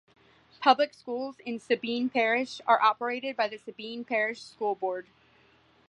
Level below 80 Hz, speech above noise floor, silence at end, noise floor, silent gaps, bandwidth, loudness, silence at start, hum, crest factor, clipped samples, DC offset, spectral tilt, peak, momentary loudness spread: -78 dBFS; 34 dB; 0.85 s; -62 dBFS; none; 11 kHz; -28 LUFS; 0.6 s; none; 22 dB; under 0.1%; under 0.1%; -3.5 dB/octave; -6 dBFS; 13 LU